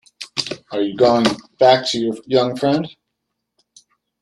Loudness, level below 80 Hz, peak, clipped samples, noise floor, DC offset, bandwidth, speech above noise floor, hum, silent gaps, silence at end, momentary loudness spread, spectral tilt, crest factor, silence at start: -18 LUFS; -58 dBFS; 0 dBFS; under 0.1%; -77 dBFS; under 0.1%; 12.5 kHz; 60 dB; none; none; 1.3 s; 11 LU; -5 dB/octave; 18 dB; 0.2 s